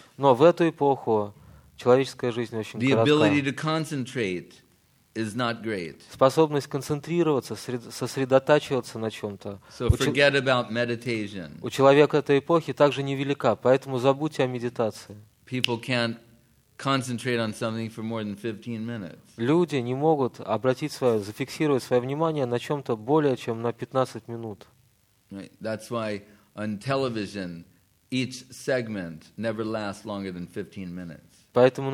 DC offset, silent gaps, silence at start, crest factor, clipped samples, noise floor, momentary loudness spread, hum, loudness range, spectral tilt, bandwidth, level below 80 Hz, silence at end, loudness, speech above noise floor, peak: under 0.1%; none; 0.2 s; 20 dB; under 0.1%; -64 dBFS; 16 LU; none; 9 LU; -6 dB/octave; 16 kHz; -50 dBFS; 0 s; -25 LUFS; 39 dB; -4 dBFS